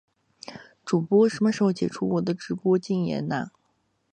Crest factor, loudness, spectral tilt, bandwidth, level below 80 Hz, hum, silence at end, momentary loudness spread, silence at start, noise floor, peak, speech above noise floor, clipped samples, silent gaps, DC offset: 16 dB; -25 LUFS; -7 dB/octave; 9.6 kHz; -64 dBFS; none; 0.65 s; 21 LU; 0.5 s; -71 dBFS; -8 dBFS; 47 dB; under 0.1%; none; under 0.1%